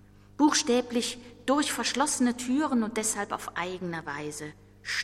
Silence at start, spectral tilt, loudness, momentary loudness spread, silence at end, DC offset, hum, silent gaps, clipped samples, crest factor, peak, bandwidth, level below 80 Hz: 0.4 s; -2.5 dB/octave; -28 LUFS; 11 LU; 0 s; under 0.1%; 50 Hz at -55 dBFS; none; under 0.1%; 18 dB; -12 dBFS; 15.5 kHz; -60 dBFS